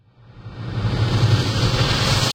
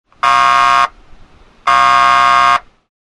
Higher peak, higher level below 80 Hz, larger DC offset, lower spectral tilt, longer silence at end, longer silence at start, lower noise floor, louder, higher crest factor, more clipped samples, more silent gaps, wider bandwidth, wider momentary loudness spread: second, -4 dBFS vs 0 dBFS; first, -34 dBFS vs -44 dBFS; neither; first, -5 dB/octave vs -1.5 dB/octave; second, 0 s vs 0.5 s; about the same, 0.35 s vs 0.25 s; about the same, -41 dBFS vs -42 dBFS; second, -19 LUFS vs -10 LUFS; about the same, 16 dB vs 12 dB; neither; neither; first, 16.5 kHz vs 11.5 kHz; first, 13 LU vs 8 LU